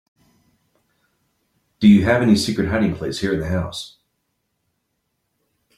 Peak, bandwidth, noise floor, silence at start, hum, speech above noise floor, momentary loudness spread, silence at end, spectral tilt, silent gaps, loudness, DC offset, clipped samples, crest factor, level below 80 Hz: -2 dBFS; 12.5 kHz; -73 dBFS; 1.8 s; none; 56 dB; 14 LU; 1.9 s; -6 dB/octave; none; -18 LUFS; under 0.1%; under 0.1%; 18 dB; -48 dBFS